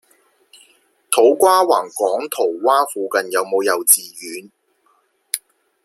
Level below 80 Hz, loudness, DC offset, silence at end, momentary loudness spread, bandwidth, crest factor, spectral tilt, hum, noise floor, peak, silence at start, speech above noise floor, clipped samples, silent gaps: -74 dBFS; -16 LUFS; under 0.1%; 0.45 s; 14 LU; 16.5 kHz; 18 dB; -1 dB/octave; none; -61 dBFS; 0 dBFS; 1.1 s; 45 dB; under 0.1%; none